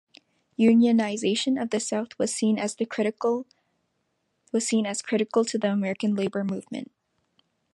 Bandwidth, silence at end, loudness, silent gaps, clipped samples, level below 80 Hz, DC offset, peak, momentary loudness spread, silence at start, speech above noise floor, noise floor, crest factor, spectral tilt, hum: 11.5 kHz; 0.9 s; -25 LUFS; none; under 0.1%; -74 dBFS; under 0.1%; -8 dBFS; 11 LU; 0.6 s; 51 dB; -75 dBFS; 18 dB; -4.5 dB/octave; none